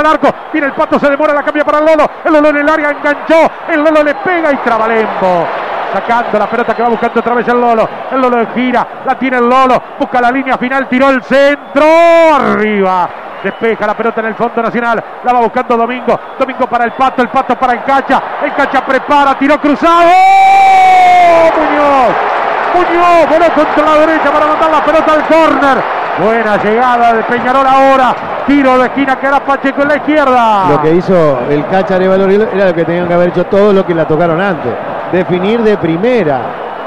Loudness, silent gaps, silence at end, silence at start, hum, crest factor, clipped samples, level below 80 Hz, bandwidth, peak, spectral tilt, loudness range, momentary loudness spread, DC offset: -9 LUFS; none; 0 s; 0 s; none; 8 dB; under 0.1%; -42 dBFS; 13 kHz; 0 dBFS; -6 dB/octave; 5 LU; 8 LU; under 0.1%